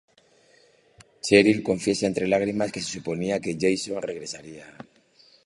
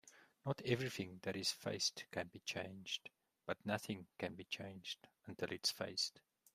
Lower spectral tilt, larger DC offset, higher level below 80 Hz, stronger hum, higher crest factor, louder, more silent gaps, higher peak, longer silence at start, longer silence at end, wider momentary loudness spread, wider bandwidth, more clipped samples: about the same, -4.5 dB/octave vs -3.5 dB/octave; neither; first, -58 dBFS vs -80 dBFS; neither; about the same, 24 dB vs 22 dB; first, -24 LUFS vs -43 LUFS; neither; first, -2 dBFS vs -22 dBFS; first, 1.25 s vs 0.05 s; first, 0.65 s vs 0.35 s; first, 19 LU vs 10 LU; second, 11.5 kHz vs 15 kHz; neither